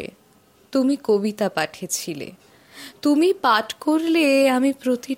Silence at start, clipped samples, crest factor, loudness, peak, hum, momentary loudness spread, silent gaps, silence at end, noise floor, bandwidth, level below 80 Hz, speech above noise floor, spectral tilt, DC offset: 0 s; under 0.1%; 18 dB; -20 LUFS; -4 dBFS; none; 16 LU; none; 0 s; -56 dBFS; 16.5 kHz; -68 dBFS; 35 dB; -4 dB/octave; under 0.1%